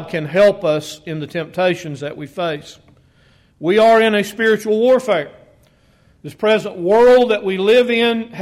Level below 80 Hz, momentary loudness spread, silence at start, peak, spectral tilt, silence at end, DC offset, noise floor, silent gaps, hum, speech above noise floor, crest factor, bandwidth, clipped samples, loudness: -54 dBFS; 16 LU; 0 s; -4 dBFS; -5 dB/octave; 0 s; under 0.1%; -53 dBFS; none; none; 38 dB; 12 dB; 14.5 kHz; under 0.1%; -15 LUFS